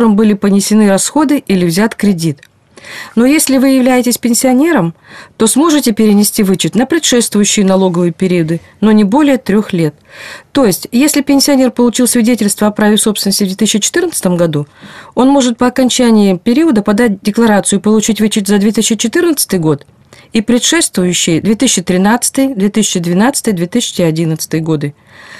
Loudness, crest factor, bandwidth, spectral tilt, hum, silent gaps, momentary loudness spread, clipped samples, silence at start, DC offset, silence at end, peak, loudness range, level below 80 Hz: -10 LUFS; 10 dB; 14.5 kHz; -4.5 dB/octave; none; none; 7 LU; under 0.1%; 0 s; 0.3%; 0 s; 0 dBFS; 2 LU; -46 dBFS